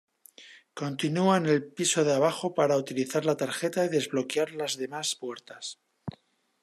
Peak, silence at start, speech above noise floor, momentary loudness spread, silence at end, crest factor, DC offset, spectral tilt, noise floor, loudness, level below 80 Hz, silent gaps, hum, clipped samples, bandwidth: -10 dBFS; 0.4 s; 33 dB; 16 LU; 0.5 s; 18 dB; under 0.1%; -4 dB/octave; -61 dBFS; -27 LUFS; -74 dBFS; none; none; under 0.1%; 13.5 kHz